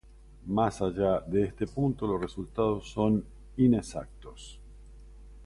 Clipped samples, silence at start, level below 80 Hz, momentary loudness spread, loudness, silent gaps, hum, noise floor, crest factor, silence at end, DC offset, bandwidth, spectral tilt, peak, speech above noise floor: under 0.1%; 0.3 s; -48 dBFS; 21 LU; -29 LUFS; none; none; -49 dBFS; 18 dB; 0 s; under 0.1%; 11.5 kHz; -7.5 dB/octave; -12 dBFS; 20 dB